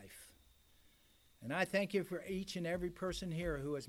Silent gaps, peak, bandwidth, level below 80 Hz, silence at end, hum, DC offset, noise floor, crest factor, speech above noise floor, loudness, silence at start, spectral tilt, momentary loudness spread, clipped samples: none; -22 dBFS; 16.5 kHz; -58 dBFS; 0 s; none; under 0.1%; -69 dBFS; 18 dB; 30 dB; -40 LUFS; 0 s; -5.5 dB/octave; 18 LU; under 0.1%